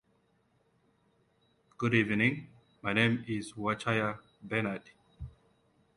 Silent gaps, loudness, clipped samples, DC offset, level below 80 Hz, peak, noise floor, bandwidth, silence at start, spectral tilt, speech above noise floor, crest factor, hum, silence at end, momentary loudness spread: none; -31 LUFS; under 0.1%; under 0.1%; -62 dBFS; -10 dBFS; -72 dBFS; 11 kHz; 1.8 s; -6 dB/octave; 41 dB; 24 dB; none; 0.65 s; 20 LU